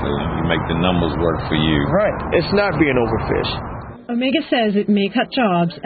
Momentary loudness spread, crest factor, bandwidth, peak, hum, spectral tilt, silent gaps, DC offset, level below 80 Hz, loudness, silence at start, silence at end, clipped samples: 5 LU; 16 dB; 4.8 kHz; -2 dBFS; none; -11.5 dB/octave; none; under 0.1%; -34 dBFS; -18 LUFS; 0 s; 0 s; under 0.1%